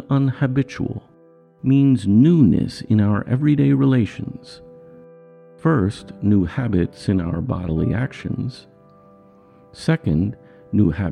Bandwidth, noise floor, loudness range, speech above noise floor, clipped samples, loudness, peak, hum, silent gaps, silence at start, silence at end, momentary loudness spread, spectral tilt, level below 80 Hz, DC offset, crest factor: 10.5 kHz; -51 dBFS; 7 LU; 33 dB; under 0.1%; -19 LUFS; -4 dBFS; none; none; 0 s; 0 s; 11 LU; -8.5 dB/octave; -44 dBFS; under 0.1%; 16 dB